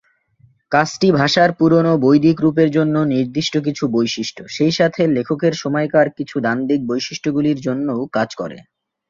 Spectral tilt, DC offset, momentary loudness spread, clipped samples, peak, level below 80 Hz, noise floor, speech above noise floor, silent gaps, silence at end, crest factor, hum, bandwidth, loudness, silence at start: -6 dB/octave; under 0.1%; 8 LU; under 0.1%; -2 dBFS; -56 dBFS; -55 dBFS; 38 dB; none; 0.45 s; 16 dB; none; 7.6 kHz; -17 LUFS; 0.7 s